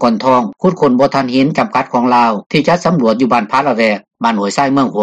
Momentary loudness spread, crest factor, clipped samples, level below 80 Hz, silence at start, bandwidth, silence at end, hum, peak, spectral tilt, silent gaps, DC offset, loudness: 4 LU; 12 dB; under 0.1%; -52 dBFS; 0 s; 9.2 kHz; 0 s; none; 0 dBFS; -6 dB/octave; 2.46-2.50 s; under 0.1%; -13 LUFS